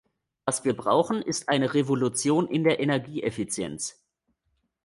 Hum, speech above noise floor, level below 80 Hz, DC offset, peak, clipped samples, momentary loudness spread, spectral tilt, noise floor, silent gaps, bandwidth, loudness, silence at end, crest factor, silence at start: none; 50 dB; -64 dBFS; under 0.1%; -8 dBFS; under 0.1%; 8 LU; -4.5 dB/octave; -75 dBFS; none; 11.5 kHz; -26 LUFS; 0.95 s; 18 dB; 0.45 s